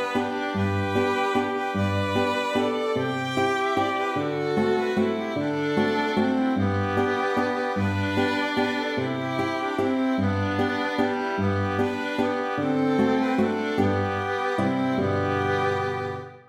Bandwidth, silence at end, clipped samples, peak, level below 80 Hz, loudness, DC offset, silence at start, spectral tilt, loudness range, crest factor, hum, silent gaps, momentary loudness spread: 15 kHz; 0.1 s; under 0.1%; -10 dBFS; -64 dBFS; -25 LUFS; under 0.1%; 0 s; -6.5 dB/octave; 1 LU; 14 dB; none; none; 3 LU